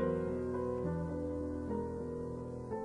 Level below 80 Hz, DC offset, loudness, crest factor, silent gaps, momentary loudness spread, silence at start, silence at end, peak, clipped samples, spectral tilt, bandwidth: -56 dBFS; under 0.1%; -39 LUFS; 14 dB; none; 5 LU; 0 s; 0 s; -22 dBFS; under 0.1%; -9.5 dB/octave; 10.5 kHz